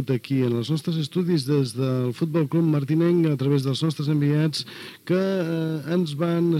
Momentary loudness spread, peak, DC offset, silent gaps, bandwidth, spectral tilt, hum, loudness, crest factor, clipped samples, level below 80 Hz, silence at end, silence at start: 5 LU; -8 dBFS; under 0.1%; none; 15 kHz; -7.5 dB/octave; none; -23 LUFS; 14 dB; under 0.1%; -70 dBFS; 0 s; 0 s